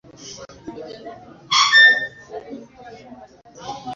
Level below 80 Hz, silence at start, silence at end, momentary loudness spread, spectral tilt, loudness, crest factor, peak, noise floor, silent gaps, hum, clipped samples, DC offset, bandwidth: -60 dBFS; 0.2 s; 0 s; 27 LU; 0 dB/octave; -13 LUFS; 20 dB; -2 dBFS; -43 dBFS; none; none; under 0.1%; under 0.1%; 7.6 kHz